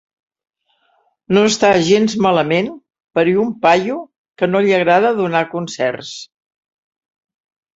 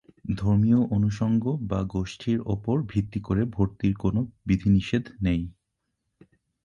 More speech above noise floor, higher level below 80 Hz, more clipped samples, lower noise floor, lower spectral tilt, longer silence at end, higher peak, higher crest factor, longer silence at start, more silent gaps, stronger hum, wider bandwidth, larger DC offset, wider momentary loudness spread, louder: second, 47 dB vs 55 dB; second, -58 dBFS vs -42 dBFS; neither; second, -61 dBFS vs -80 dBFS; second, -5 dB/octave vs -8.5 dB/octave; first, 1.5 s vs 1.15 s; first, 0 dBFS vs -10 dBFS; about the same, 16 dB vs 16 dB; first, 1.3 s vs 0.25 s; first, 4.18-4.24 s vs none; neither; about the same, 8 kHz vs 7.4 kHz; neither; first, 12 LU vs 7 LU; first, -15 LUFS vs -26 LUFS